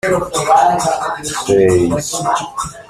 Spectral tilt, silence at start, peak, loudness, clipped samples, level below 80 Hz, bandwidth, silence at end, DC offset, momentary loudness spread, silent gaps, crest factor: -4.5 dB/octave; 0.05 s; -2 dBFS; -15 LUFS; under 0.1%; -42 dBFS; 15 kHz; 0.05 s; under 0.1%; 8 LU; none; 14 dB